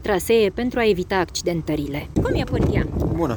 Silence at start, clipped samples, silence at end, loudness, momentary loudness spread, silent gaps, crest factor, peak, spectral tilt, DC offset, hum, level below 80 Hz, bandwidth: 0 s; under 0.1%; 0 s; -21 LUFS; 6 LU; none; 16 dB; -6 dBFS; -6 dB/octave; under 0.1%; none; -32 dBFS; over 20 kHz